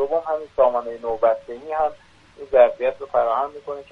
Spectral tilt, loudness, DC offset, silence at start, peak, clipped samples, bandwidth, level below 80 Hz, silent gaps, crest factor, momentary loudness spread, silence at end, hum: -6 dB/octave; -21 LUFS; under 0.1%; 0 s; -2 dBFS; under 0.1%; 6 kHz; -56 dBFS; none; 18 dB; 11 LU; 0.1 s; none